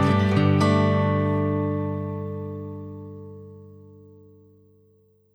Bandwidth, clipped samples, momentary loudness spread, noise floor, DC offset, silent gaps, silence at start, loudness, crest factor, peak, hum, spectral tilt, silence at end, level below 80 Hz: 10 kHz; under 0.1%; 21 LU; -60 dBFS; under 0.1%; none; 0 s; -23 LUFS; 16 dB; -8 dBFS; 60 Hz at -70 dBFS; -8 dB/octave; 1.4 s; -62 dBFS